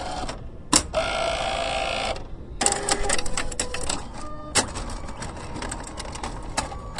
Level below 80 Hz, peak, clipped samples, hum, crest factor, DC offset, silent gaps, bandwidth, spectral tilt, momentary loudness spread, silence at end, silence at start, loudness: -36 dBFS; -2 dBFS; under 0.1%; none; 26 dB; under 0.1%; none; 11.5 kHz; -2 dB/octave; 14 LU; 0 s; 0 s; -26 LUFS